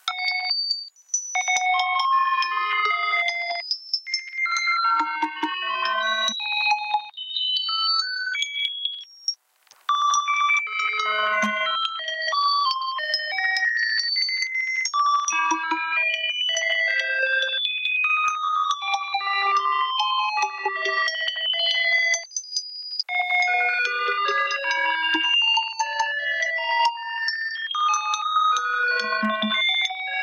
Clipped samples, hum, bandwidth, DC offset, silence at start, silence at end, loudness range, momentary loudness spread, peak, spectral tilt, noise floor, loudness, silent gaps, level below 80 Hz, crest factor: under 0.1%; none; 14.5 kHz; under 0.1%; 0.05 s; 0 s; 2 LU; 6 LU; -10 dBFS; 0.5 dB/octave; -57 dBFS; -22 LUFS; none; -82 dBFS; 14 dB